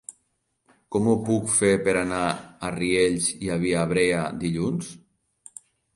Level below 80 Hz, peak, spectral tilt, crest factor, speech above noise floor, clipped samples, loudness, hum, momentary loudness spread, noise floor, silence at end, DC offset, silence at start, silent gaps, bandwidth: -52 dBFS; -6 dBFS; -4.5 dB/octave; 18 dB; 50 dB; under 0.1%; -24 LUFS; none; 15 LU; -73 dBFS; 1 s; under 0.1%; 0.1 s; none; 11.5 kHz